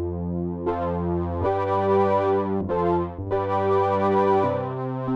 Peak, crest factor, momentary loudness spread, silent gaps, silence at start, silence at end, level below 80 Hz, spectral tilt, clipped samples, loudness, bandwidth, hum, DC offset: -10 dBFS; 12 dB; 7 LU; none; 0 s; 0 s; -46 dBFS; -9.5 dB/octave; under 0.1%; -23 LUFS; 6.2 kHz; none; under 0.1%